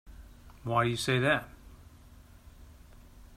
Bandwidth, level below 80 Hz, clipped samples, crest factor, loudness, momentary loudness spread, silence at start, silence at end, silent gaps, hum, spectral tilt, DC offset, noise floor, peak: 15.5 kHz; -54 dBFS; under 0.1%; 20 dB; -29 LUFS; 15 LU; 0.05 s; 0 s; none; none; -5 dB/octave; under 0.1%; -54 dBFS; -14 dBFS